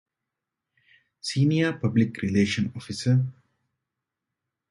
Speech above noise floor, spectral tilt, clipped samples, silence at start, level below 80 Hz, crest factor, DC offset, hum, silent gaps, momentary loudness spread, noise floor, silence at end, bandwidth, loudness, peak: 62 dB; -6.5 dB/octave; under 0.1%; 1.25 s; -54 dBFS; 18 dB; under 0.1%; none; none; 8 LU; -86 dBFS; 1.4 s; 11.5 kHz; -25 LUFS; -10 dBFS